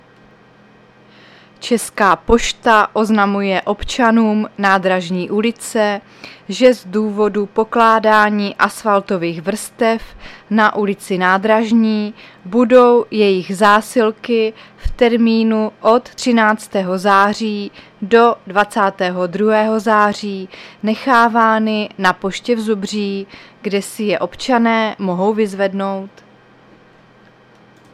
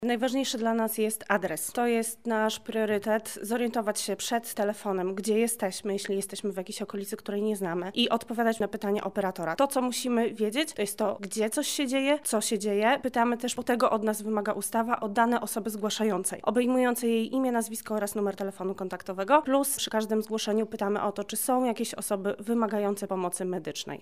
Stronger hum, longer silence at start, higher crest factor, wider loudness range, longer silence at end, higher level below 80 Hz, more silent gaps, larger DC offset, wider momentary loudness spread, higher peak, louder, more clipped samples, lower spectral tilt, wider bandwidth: neither; first, 1.6 s vs 0 s; about the same, 16 dB vs 20 dB; about the same, 4 LU vs 3 LU; first, 1.85 s vs 0.05 s; first, -40 dBFS vs -70 dBFS; neither; second, under 0.1% vs 0.2%; first, 11 LU vs 6 LU; first, 0 dBFS vs -8 dBFS; first, -15 LUFS vs -28 LUFS; neither; first, -5 dB/octave vs -3.5 dB/octave; second, 14 kHz vs 16 kHz